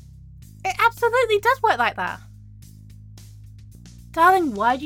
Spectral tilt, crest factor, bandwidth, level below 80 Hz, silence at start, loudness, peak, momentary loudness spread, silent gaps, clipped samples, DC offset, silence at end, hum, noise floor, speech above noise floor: -4.5 dB/octave; 20 dB; 17.5 kHz; -48 dBFS; 0.4 s; -20 LUFS; -4 dBFS; 13 LU; none; under 0.1%; under 0.1%; 0 s; none; -43 dBFS; 24 dB